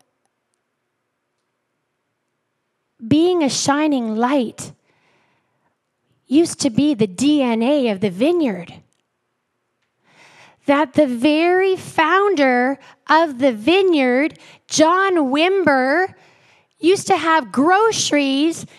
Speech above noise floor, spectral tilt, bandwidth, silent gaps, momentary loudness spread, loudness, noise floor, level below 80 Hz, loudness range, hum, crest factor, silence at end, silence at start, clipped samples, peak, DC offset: 57 dB; -4 dB/octave; 13 kHz; none; 6 LU; -17 LUFS; -73 dBFS; -64 dBFS; 6 LU; none; 16 dB; 0.15 s; 3 s; under 0.1%; -2 dBFS; under 0.1%